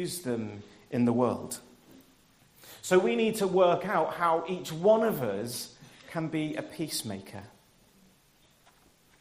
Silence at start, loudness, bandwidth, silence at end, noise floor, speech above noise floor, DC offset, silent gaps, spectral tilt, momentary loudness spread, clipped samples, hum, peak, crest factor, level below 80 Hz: 0 s; -29 LUFS; 15.5 kHz; 1.75 s; -63 dBFS; 35 dB; under 0.1%; none; -5 dB/octave; 17 LU; under 0.1%; none; -8 dBFS; 22 dB; -68 dBFS